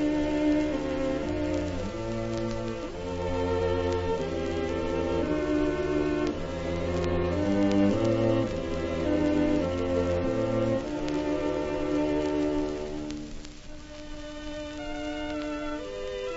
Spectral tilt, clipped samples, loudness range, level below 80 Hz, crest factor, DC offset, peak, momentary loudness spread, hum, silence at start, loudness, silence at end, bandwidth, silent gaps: -7 dB/octave; under 0.1%; 6 LU; -42 dBFS; 16 dB; under 0.1%; -12 dBFS; 11 LU; none; 0 s; -29 LUFS; 0 s; 8 kHz; none